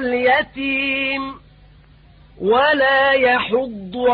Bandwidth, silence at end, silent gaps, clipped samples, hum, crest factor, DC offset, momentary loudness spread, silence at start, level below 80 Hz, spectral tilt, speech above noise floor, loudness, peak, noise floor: 5 kHz; 0 s; none; under 0.1%; none; 14 dB; under 0.1%; 11 LU; 0 s; -50 dBFS; -9 dB/octave; 30 dB; -17 LUFS; -4 dBFS; -47 dBFS